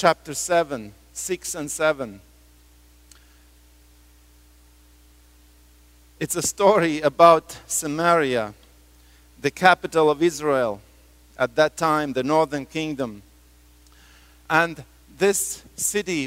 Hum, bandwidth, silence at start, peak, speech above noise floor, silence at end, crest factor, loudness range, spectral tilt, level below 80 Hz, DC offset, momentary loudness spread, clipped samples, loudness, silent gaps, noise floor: 60 Hz at -55 dBFS; 16 kHz; 0 s; 0 dBFS; 32 dB; 0 s; 24 dB; 10 LU; -3.5 dB/octave; -54 dBFS; under 0.1%; 13 LU; under 0.1%; -21 LUFS; none; -53 dBFS